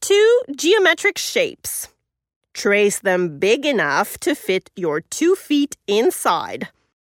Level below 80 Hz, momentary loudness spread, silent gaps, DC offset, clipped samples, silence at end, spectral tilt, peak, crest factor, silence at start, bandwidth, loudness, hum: -62 dBFS; 12 LU; 2.36-2.41 s; under 0.1%; under 0.1%; 0.5 s; -3 dB/octave; -4 dBFS; 16 dB; 0 s; 18 kHz; -18 LUFS; none